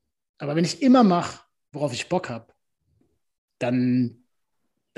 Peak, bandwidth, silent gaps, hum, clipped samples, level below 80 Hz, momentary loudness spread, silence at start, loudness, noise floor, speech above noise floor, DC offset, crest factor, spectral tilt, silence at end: -6 dBFS; 11.5 kHz; 3.38-3.48 s; none; under 0.1%; -66 dBFS; 18 LU; 0.4 s; -23 LUFS; -80 dBFS; 58 dB; under 0.1%; 18 dB; -6 dB/octave; 0.85 s